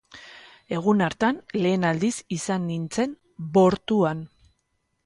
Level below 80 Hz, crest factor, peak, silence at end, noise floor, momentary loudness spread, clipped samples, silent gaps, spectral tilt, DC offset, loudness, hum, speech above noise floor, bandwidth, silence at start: -58 dBFS; 18 dB; -8 dBFS; 0.8 s; -74 dBFS; 18 LU; under 0.1%; none; -6 dB/octave; under 0.1%; -24 LUFS; none; 51 dB; 11.5 kHz; 0.15 s